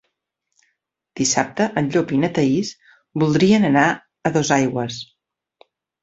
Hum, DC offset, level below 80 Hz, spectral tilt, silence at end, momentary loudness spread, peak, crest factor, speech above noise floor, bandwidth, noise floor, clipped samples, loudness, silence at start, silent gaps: none; under 0.1%; -56 dBFS; -5 dB/octave; 1 s; 15 LU; -2 dBFS; 18 dB; 58 dB; 8.2 kHz; -76 dBFS; under 0.1%; -19 LUFS; 1.15 s; none